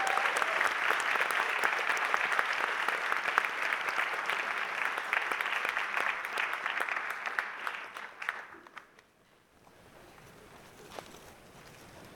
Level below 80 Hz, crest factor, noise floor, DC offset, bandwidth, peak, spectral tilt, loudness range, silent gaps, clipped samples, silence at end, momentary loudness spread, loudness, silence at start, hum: -74 dBFS; 26 dB; -65 dBFS; under 0.1%; 19 kHz; -8 dBFS; -0.5 dB/octave; 17 LU; none; under 0.1%; 0 s; 19 LU; -31 LUFS; 0 s; none